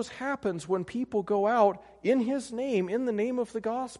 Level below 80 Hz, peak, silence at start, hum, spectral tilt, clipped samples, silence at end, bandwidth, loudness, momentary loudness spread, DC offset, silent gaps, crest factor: -66 dBFS; -10 dBFS; 0 s; none; -6 dB/octave; under 0.1%; 0 s; 11.5 kHz; -29 LUFS; 7 LU; under 0.1%; none; 18 dB